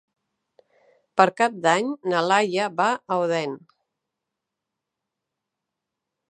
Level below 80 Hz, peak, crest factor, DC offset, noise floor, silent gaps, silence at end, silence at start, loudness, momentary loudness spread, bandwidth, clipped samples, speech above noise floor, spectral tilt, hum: -82 dBFS; 0 dBFS; 24 dB; under 0.1%; -84 dBFS; none; 2.75 s; 1.15 s; -22 LUFS; 8 LU; 11 kHz; under 0.1%; 62 dB; -4 dB/octave; none